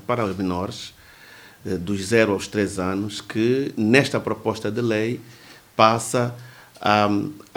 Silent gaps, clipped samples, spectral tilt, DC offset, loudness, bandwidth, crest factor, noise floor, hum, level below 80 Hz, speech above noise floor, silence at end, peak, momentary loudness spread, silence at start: none; under 0.1%; -5 dB/octave; under 0.1%; -22 LUFS; over 20 kHz; 22 dB; -46 dBFS; none; -60 dBFS; 25 dB; 0.15 s; 0 dBFS; 13 LU; 0.1 s